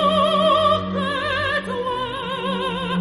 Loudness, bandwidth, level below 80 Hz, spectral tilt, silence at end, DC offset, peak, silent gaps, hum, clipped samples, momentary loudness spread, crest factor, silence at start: -21 LUFS; 11.5 kHz; -48 dBFS; -5.5 dB/octave; 0 s; under 0.1%; -6 dBFS; none; none; under 0.1%; 9 LU; 14 dB; 0 s